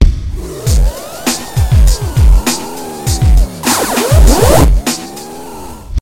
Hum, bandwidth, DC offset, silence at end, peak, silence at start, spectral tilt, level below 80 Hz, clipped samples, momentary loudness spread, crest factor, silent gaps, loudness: none; 17 kHz; under 0.1%; 0 s; 0 dBFS; 0 s; -5 dB/octave; -12 dBFS; 0.7%; 16 LU; 10 dB; none; -12 LUFS